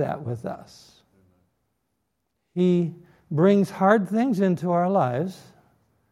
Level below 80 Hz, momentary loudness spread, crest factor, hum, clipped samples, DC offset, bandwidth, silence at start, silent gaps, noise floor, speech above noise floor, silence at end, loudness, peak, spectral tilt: -68 dBFS; 13 LU; 22 dB; none; under 0.1%; under 0.1%; 12.5 kHz; 0 s; none; -77 dBFS; 54 dB; 0.75 s; -23 LUFS; -2 dBFS; -8.5 dB/octave